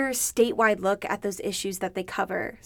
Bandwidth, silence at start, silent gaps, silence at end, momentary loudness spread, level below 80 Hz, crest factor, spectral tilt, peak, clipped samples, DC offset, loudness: over 20 kHz; 0 s; none; 0.1 s; 8 LU; -58 dBFS; 18 dB; -3 dB/octave; -8 dBFS; under 0.1%; under 0.1%; -26 LUFS